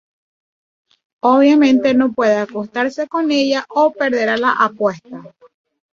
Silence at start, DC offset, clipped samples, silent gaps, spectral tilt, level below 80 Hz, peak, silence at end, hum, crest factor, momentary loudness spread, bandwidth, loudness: 1.25 s; under 0.1%; under 0.1%; none; -5 dB/octave; -62 dBFS; -2 dBFS; 0.65 s; none; 14 dB; 9 LU; 7.4 kHz; -15 LUFS